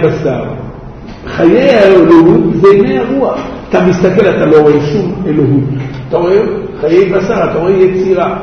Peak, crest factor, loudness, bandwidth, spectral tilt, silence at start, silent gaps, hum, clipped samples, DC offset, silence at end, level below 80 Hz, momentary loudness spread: 0 dBFS; 8 dB; -9 LUFS; 6.6 kHz; -8 dB/octave; 0 s; none; none; 2%; under 0.1%; 0 s; -34 dBFS; 14 LU